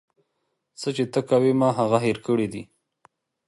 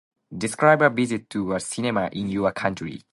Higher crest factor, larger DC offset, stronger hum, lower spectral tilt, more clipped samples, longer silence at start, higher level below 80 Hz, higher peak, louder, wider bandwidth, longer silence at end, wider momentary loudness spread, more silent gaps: about the same, 20 dB vs 20 dB; neither; neither; first, -6.5 dB/octave vs -5 dB/octave; neither; first, 0.8 s vs 0.3 s; second, -64 dBFS vs -56 dBFS; about the same, -6 dBFS vs -4 dBFS; about the same, -23 LUFS vs -23 LUFS; about the same, 11.5 kHz vs 11.5 kHz; first, 0.85 s vs 0.15 s; about the same, 10 LU vs 12 LU; neither